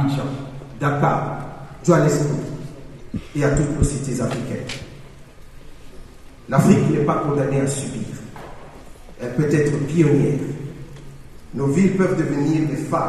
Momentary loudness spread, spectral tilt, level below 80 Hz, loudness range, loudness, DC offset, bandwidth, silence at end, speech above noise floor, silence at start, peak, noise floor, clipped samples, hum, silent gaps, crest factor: 19 LU; -7 dB/octave; -38 dBFS; 4 LU; -20 LUFS; under 0.1%; 13.5 kHz; 0 s; 21 dB; 0 s; -2 dBFS; -40 dBFS; under 0.1%; none; none; 20 dB